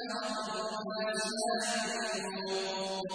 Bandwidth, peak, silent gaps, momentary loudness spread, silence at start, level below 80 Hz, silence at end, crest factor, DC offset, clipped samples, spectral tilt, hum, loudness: 10.5 kHz; -22 dBFS; none; 4 LU; 0 s; -76 dBFS; 0 s; 14 dB; under 0.1%; under 0.1%; -2.5 dB/octave; none; -34 LUFS